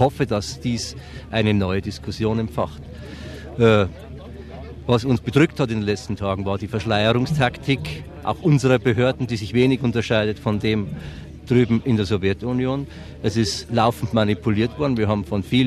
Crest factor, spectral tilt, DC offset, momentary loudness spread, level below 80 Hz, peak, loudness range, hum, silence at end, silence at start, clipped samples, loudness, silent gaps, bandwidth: 20 dB; -6.5 dB/octave; under 0.1%; 16 LU; -44 dBFS; -2 dBFS; 3 LU; none; 0 s; 0 s; under 0.1%; -21 LUFS; none; 13.5 kHz